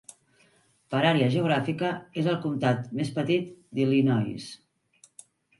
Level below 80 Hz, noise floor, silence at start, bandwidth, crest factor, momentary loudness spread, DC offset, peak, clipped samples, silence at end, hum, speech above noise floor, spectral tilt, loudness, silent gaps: -68 dBFS; -64 dBFS; 0.9 s; 11.5 kHz; 18 dB; 9 LU; under 0.1%; -8 dBFS; under 0.1%; 1.05 s; none; 38 dB; -7 dB/octave; -26 LUFS; none